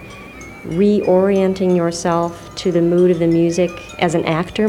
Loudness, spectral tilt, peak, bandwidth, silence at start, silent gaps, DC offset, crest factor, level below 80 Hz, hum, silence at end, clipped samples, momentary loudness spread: -16 LUFS; -6.5 dB/octave; 0 dBFS; 12 kHz; 0 s; none; under 0.1%; 16 dB; -44 dBFS; none; 0 s; under 0.1%; 11 LU